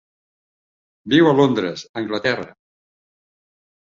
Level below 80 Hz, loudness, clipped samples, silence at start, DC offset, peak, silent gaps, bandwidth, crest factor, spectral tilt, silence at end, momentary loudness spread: -60 dBFS; -18 LUFS; under 0.1%; 1.05 s; under 0.1%; -2 dBFS; 1.89-1.94 s; 7.4 kHz; 20 dB; -6 dB/octave; 1.4 s; 13 LU